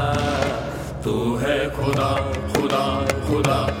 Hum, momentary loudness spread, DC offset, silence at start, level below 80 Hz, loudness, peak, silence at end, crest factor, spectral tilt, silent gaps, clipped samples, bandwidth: none; 5 LU; under 0.1%; 0 s; -36 dBFS; -22 LUFS; 0 dBFS; 0 s; 22 dB; -5.5 dB/octave; none; under 0.1%; 17.5 kHz